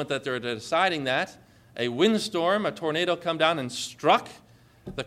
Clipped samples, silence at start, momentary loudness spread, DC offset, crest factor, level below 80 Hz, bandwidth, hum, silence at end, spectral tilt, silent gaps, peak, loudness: under 0.1%; 0 s; 11 LU; under 0.1%; 20 dB; -62 dBFS; 15 kHz; 60 Hz at -55 dBFS; 0 s; -4 dB/octave; none; -8 dBFS; -26 LUFS